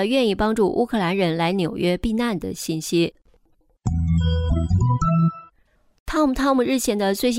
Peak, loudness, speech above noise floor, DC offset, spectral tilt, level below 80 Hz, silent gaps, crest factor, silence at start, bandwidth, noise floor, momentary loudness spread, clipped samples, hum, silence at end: -8 dBFS; -21 LUFS; 40 dB; under 0.1%; -6 dB/octave; -36 dBFS; 6.00-6.06 s; 14 dB; 0 s; 16 kHz; -61 dBFS; 7 LU; under 0.1%; none; 0 s